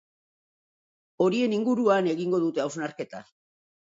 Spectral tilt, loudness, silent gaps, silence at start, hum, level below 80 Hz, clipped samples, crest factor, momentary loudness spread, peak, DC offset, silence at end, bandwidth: -6 dB/octave; -26 LUFS; none; 1.2 s; none; -74 dBFS; under 0.1%; 18 dB; 15 LU; -10 dBFS; under 0.1%; 0.75 s; 7.8 kHz